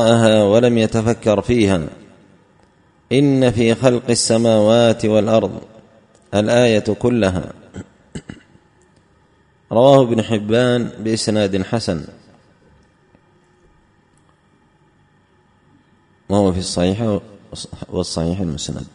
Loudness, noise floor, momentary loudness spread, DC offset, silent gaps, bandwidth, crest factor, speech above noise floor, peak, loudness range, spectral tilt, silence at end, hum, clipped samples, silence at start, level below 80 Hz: -16 LUFS; -56 dBFS; 20 LU; under 0.1%; none; 10.5 kHz; 18 dB; 40 dB; 0 dBFS; 8 LU; -5.5 dB/octave; 0.05 s; none; under 0.1%; 0 s; -46 dBFS